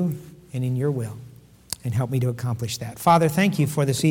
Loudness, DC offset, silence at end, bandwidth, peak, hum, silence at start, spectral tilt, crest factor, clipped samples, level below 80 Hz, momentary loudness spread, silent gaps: -23 LUFS; under 0.1%; 0 s; 18.5 kHz; -6 dBFS; none; 0 s; -6 dB/octave; 18 dB; under 0.1%; -56 dBFS; 16 LU; none